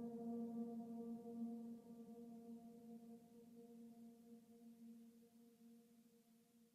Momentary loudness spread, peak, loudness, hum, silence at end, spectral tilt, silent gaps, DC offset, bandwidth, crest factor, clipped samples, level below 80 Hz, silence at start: 18 LU; -40 dBFS; -55 LUFS; none; 0.05 s; -8 dB/octave; none; under 0.1%; 15 kHz; 16 dB; under 0.1%; under -90 dBFS; 0 s